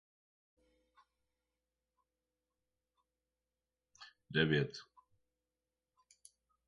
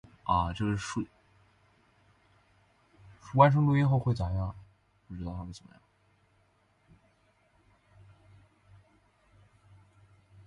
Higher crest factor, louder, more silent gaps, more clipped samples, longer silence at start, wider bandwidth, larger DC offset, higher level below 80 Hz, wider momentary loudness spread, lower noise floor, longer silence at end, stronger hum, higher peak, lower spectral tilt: about the same, 28 dB vs 26 dB; second, -35 LUFS vs -29 LUFS; neither; neither; first, 4 s vs 0.25 s; second, 9 kHz vs 10 kHz; neither; second, -72 dBFS vs -50 dBFS; first, 26 LU vs 22 LU; first, under -90 dBFS vs -69 dBFS; second, 1.85 s vs 4.9 s; neither; second, -16 dBFS vs -8 dBFS; second, -6 dB/octave vs -7.5 dB/octave